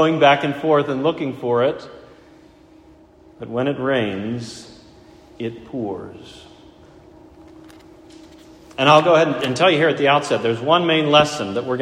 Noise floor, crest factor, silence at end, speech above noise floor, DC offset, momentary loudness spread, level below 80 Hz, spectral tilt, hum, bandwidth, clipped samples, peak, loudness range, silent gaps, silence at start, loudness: -48 dBFS; 20 dB; 0 s; 30 dB; under 0.1%; 19 LU; -56 dBFS; -5 dB/octave; none; 12.5 kHz; under 0.1%; 0 dBFS; 18 LU; none; 0 s; -18 LUFS